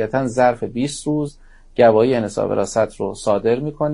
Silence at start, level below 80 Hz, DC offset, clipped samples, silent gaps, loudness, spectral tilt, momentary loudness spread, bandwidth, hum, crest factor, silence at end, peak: 0 s; -46 dBFS; under 0.1%; under 0.1%; none; -18 LUFS; -6 dB/octave; 10 LU; 11 kHz; none; 18 dB; 0 s; 0 dBFS